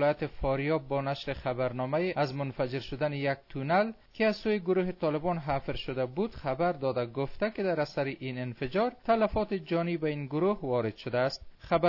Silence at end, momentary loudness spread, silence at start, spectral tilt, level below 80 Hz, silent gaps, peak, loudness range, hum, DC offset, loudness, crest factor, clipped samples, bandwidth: 0 s; 6 LU; 0 s; -8 dB/octave; -50 dBFS; none; -14 dBFS; 2 LU; none; under 0.1%; -31 LUFS; 16 dB; under 0.1%; 6 kHz